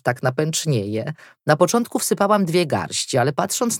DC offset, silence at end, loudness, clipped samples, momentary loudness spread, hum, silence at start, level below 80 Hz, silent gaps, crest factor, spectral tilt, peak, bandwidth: under 0.1%; 0 s; -20 LUFS; under 0.1%; 8 LU; none; 0.05 s; -66 dBFS; none; 18 dB; -4.5 dB/octave; -2 dBFS; 18 kHz